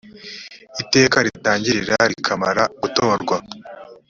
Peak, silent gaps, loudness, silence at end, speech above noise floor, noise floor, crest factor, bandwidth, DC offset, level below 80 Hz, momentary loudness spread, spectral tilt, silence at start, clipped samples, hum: 0 dBFS; none; -18 LUFS; 0.15 s; 20 dB; -39 dBFS; 20 dB; 7.8 kHz; under 0.1%; -56 dBFS; 20 LU; -3.5 dB/octave; 0.05 s; under 0.1%; none